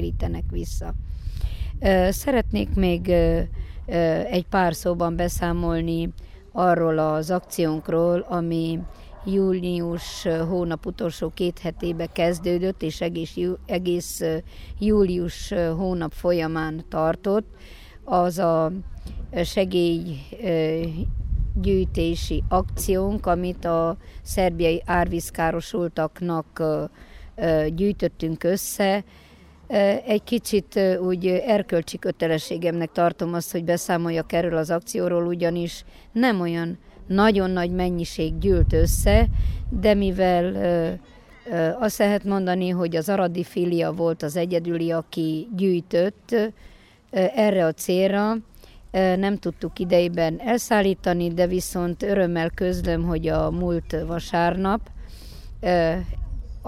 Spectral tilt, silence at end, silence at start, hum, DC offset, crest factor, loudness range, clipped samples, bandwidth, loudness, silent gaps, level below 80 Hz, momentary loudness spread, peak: -6 dB/octave; 0 s; 0 s; none; under 0.1%; 20 dB; 3 LU; under 0.1%; 16 kHz; -23 LUFS; none; -34 dBFS; 9 LU; -4 dBFS